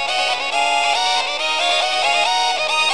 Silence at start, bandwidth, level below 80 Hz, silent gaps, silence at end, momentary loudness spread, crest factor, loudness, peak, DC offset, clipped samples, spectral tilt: 0 s; 13 kHz; -64 dBFS; none; 0 s; 2 LU; 14 dB; -16 LUFS; -4 dBFS; 1%; under 0.1%; 1.5 dB/octave